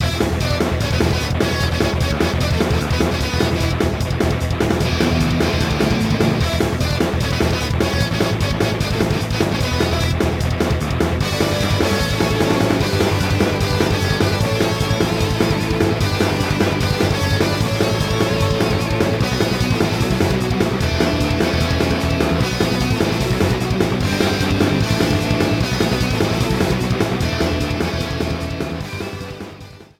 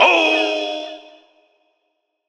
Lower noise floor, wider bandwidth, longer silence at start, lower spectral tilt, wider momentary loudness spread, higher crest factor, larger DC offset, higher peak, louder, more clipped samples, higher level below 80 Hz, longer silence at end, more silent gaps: second, -38 dBFS vs -72 dBFS; first, 17 kHz vs 10 kHz; about the same, 0 s vs 0 s; first, -5.5 dB/octave vs -0.5 dB/octave; second, 2 LU vs 21 LU; about the same, 16 dB vs 20 dB; neither; about the same, -2 dBFS vs 0 dBFS; about the same, -18 LUFS vs -17 LUFS; neither; first, -28 dBFS vs -84 dBFS; second, 0.15 s vs 1.3 s; neither